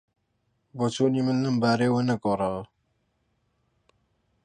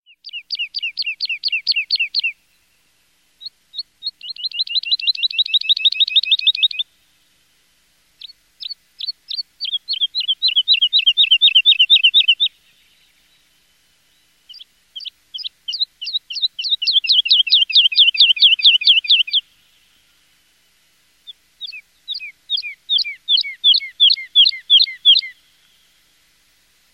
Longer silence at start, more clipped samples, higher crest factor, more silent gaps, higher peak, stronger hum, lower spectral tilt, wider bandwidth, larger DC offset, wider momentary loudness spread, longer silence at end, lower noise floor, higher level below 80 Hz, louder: first, 0.75 s vs 0.25 s; neither; about the same, 18 dB vs 16 dB; neither; second, -10 dBFS vs -2 dBFS; neither; first, -6.5 dB/octave vs 4.5 dB/octave; second, 10 kHz vs 15 kHz; neither; second, 7 LU vs 21 LU; first, 1.8 s vs 1.6 s; first, -73 dBFS vs -60 dBFS; first, -62 dBFS vs -72 dBFS; second, -25 LUFS vs -13 LUFS